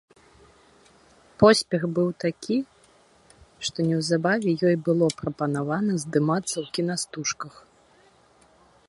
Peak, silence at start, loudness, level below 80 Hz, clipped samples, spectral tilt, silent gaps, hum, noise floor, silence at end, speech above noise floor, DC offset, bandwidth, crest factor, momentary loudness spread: -2 dBFS; 1.4 s; -24 LUFS; -60 dBFS; under 0.1%; -5 dB/octave; none; none; -58 dBFS; 1.4 s; 34 dB; under 0.1%; 11.5 kHz; 24 dB; 10 LU